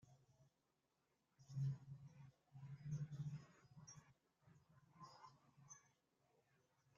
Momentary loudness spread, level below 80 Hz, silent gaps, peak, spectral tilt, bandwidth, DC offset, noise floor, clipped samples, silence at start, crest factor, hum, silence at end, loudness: 18 LU; -84 dBFS; none; -36 dBFS; -8 dB/octave; 7.4 kHz; under 0.1%; -87 dBFS; under 0.1%; 0.05 s; 20 dB; none; 1.1 s; -54 LUFS